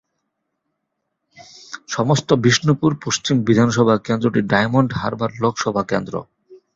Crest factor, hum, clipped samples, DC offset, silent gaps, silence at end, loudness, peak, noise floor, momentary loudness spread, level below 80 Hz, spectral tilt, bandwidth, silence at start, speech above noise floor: 18 dB; none; under 0.1%; under 0.1%; none; 0.2 s; -18 LUFS; -2 dBFS; -76 dBFS; 9 LU; -52 dBFS; -5.5 dB/octave; 7.8 kHz; 1.4 s; 58 dB